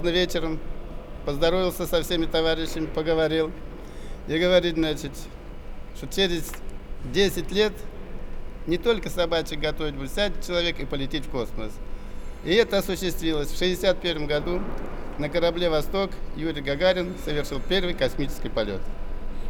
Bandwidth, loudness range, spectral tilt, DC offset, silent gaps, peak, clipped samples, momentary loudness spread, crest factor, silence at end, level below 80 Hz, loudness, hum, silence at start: 18.5 kHz; 2 LU; -4.5 dB/octave; under 0.1%; none; -4 dBFS; under 0.1%; 17 LU; 20 dB; 0 s; -34 dBFS; -26 LUFS; none; 0 s